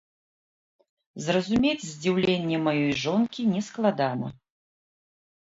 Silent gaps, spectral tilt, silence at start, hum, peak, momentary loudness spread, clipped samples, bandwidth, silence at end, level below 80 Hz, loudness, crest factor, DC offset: none; -5.5 dB/octave; 1.15 s; none; -10 dBFS; 5 LU; under 0.1%; 8 kHz; 1.1 s; -60 dBFS; -26 LUFS; 18 dB; under 0.1%